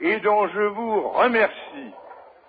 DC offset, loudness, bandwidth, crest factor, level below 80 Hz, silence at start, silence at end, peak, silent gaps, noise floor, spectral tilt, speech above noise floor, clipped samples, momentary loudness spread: under 0.1%; -21 LUFS; 4.9 kHz; 16 dB; -66 dBFS; 0 s; 0.3 s; -6 dBFS; none; -45 dBFS; -8 dB/octave; 24 dB; under 0.1%; 19 LU